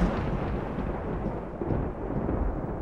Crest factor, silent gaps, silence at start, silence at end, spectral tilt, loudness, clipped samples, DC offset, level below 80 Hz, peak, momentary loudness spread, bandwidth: 18 dB; none; 0 s; 0 s; -9.5 dB/octave; -32 LUFS; under 0.1%; 0.3%; -36 dBFS; -12 dBFS; 3 LU; 6.8 kHz